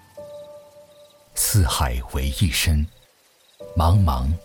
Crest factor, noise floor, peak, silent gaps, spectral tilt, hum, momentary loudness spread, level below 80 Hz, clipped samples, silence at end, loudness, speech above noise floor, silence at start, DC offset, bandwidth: 14 dB; -57 dBFS; -8 dBFS; none; -4.5 dB/octave; none; 21 LU; -30 dBFS; under 0.1%; 0.05 s; -21 LUFS; 38 dB; 0.15 s; under 0.1%; over 20 kHz